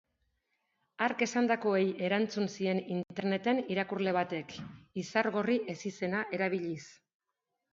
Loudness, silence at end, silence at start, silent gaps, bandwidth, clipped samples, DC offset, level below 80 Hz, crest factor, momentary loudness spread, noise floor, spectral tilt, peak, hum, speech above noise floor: -32 LUFS; 0.8 s; 1 s; none; 7.6 kHz; under 0.1%; under 0.1%; -74 dBFS; 20 dB; 10 LU; -86 dBFS; -5.5 dB/octave; -14 dBFS; none; 54 dB